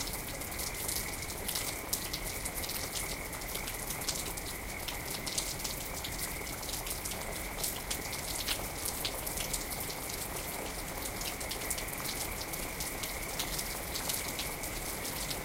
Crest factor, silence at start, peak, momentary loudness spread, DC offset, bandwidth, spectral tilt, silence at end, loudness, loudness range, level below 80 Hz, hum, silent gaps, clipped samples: 26 dB; 0 s; -12 dBFS; 4 LU; under 0.1%; 16.5 kHz; -2 dB/octave; 0 s; -36 LUFS; 1 LU; -48 dBFS; none; none; under 0.1%